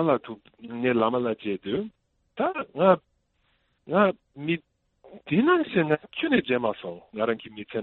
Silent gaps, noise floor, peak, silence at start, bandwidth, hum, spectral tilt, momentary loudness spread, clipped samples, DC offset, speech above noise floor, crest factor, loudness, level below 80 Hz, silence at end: none; -70 dBFS; -6 dBFS; 0 s; 4.2 kHz; none; -10 dB/octave; 15 LU; under 0.1%; under 0.1%; 45 dB; 20 dB; -26 LUFS; -66 dBFS; 0 s